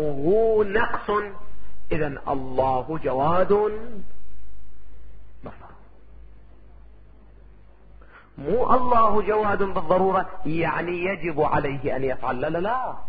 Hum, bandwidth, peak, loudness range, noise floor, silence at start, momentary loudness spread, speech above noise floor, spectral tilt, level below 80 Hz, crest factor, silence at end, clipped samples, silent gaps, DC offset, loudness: none; 4.9 kHz; -6 dBFS; 7 LU; -50 dBFS; 0 s; 15 LU; 29 dB; -11 dB/octave; -44 dBFS; 18 dB; 0 s; under 0.1%; none; under 0.1%; -23 LUFS